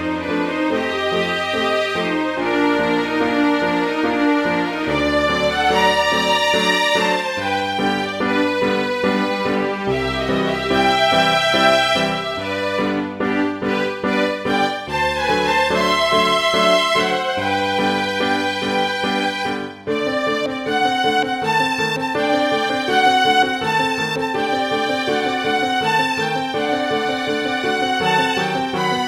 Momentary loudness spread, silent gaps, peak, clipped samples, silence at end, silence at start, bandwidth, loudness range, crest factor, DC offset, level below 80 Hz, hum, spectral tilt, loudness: 6 LU; none; -2 dBFS; under 0.1%; 0 s; 0 s; 16.5 kHz; 3 LU; 16 dB; under 0.1%; -46 dBFS; none; -4 dB/octave; -18 LUFS